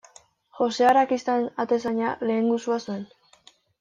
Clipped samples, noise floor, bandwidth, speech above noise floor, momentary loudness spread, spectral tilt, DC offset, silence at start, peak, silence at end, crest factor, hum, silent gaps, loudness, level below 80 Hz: under 0.1%; -57 dBFS; 11 kHz; 34 dB; 11 LU; -5 dB/octave; under 0.1%; 0.55 s; -8 dBFS; 0.75 s; 16 dB; none; none; -24 LUFS; -70 dBFS